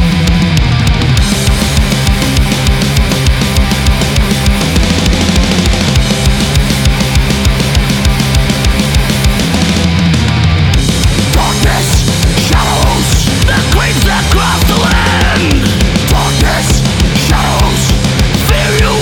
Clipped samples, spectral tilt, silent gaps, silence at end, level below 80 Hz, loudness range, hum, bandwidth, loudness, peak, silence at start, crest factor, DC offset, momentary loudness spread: under 0.1%; -4.5 dB/octave; none; 0 s; -14 dBFS; 1 LU; none; 19.5 kHz; -10 LUFS; 0 dBFS; 0 s; 8 dB; under 0.1%; 1 LU